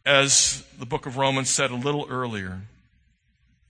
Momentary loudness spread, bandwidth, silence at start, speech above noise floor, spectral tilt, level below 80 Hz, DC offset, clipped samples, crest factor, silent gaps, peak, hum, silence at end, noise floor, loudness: 16 LU; 10 kHz; 0.05 s; 42 dB; -2 dB/octave; -56 dBFS; under 0.1%; under 0.1%; 24 dB; none; -2 dBFS; none; 1 s; -65 dBFS; -22 LUFS